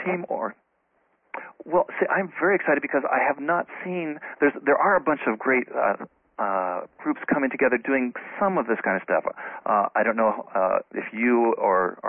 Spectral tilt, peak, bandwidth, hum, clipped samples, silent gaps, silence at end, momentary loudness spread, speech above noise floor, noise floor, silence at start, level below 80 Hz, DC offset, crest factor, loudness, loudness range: -11 dB/octave; -8 dBFS; 3.6 kHz; none; under 0.1%; none; 0 s; 10 LU; 45 dB; -69 dBFS; 0 s; -68 dBFS; under 0.1%; 16 dB; -24 LUFS; 2 LU